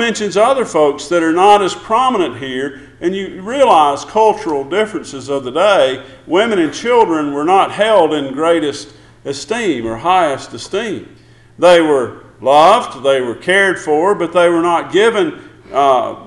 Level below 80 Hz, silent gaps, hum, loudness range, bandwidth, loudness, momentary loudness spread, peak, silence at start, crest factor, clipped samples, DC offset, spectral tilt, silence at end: -50 dBFS; none; none; 3 LU; 11.5 kHz; -13 LUFS; 12 LU; 0 dBFS; 0 s; 14 dB; under 0.1%; under 0.1%; -4 dB/octave; 0 s